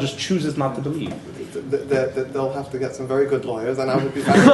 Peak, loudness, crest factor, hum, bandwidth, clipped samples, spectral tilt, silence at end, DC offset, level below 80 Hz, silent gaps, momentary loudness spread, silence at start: 0 dBFS; -22 LUFS; 20 dB; none; 12 kHz; under 0.1%; -6 dB/octave; 0 s; under 0.1%; -56 dBFS; none; 8 LU; 0 s